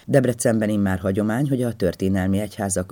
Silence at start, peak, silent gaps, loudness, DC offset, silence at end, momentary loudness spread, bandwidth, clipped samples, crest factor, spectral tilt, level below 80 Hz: 0.05 s; -2 dBFS; none; -22 LUFS; under 0.1%; 0.05 s; 4 LU; 19 kHz; under 0.1%; 18 dB; -6 dB/octave; -52 dBFS